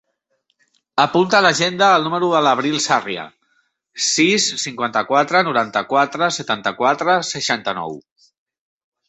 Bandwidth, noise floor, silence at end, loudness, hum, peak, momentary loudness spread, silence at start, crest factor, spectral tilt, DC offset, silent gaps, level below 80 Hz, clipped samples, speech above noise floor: 8.4 kHz; -69 dBFS; 1.1 s; -17 LUFS; none; 0 dBFS; 11 LU; 0.95 s; 18 dB; -3 dB/octave; under 0.1%; none; -64 dBFS; under 0.1%; 51 dB